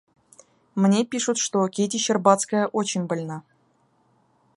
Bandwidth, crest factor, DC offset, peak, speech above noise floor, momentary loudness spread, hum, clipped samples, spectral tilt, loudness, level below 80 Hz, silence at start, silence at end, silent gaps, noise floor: 11.5 kHz; 22 dB; under 0.1%; -2 dBFS; 42 dB; 11 LU; none; under 0.1%; -4.5 dB/octave; -23 LUFS; -72 dBFS; 0.75 s; 1.15 s; none; -64 dBFS